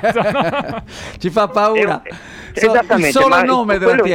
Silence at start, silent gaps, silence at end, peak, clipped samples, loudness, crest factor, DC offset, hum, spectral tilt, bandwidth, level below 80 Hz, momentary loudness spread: 0 s; none; 0 s; -4 dBFS; under 0.1%; -14 LUFS; 12 dB; under 0.1%; none; -5 dB/octave; 16.5 kHz; -42 dBFS; 16 LU